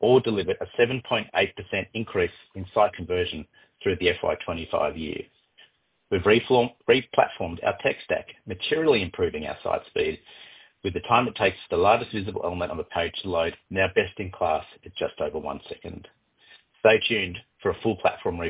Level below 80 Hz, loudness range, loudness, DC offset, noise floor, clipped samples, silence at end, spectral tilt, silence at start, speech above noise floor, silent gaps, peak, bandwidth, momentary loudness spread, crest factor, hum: -48 dBFS; 3 LU; -25 LUFS; under 0.1%; -60 dBFS; under 0.1%; 0 s; -9 dB/octave; 0 s; 35 dB; none; -4 dBFS; 4 kHz; 13 LU; 22 dB; none